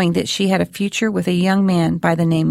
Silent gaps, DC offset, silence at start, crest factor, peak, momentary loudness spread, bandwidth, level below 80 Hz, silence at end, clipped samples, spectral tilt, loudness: none; under 0.1%; 0 s; 16 dB; 0 dBFS; 3 LU; 14 kHz; -50 dBFS; 0 s; under 0.1%; -6 dB/octave; -17 LUFS